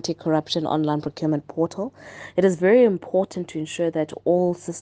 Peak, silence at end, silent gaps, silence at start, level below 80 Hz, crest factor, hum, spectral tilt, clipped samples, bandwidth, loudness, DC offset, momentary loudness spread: -4 dBFS; 0 s; none; 0.05 s; -64 dBFS; 18 dB; none; -6 dB/octave; under 0.1%; 9.6 kHz; -22 LUFS; under 0.1%; 12 LU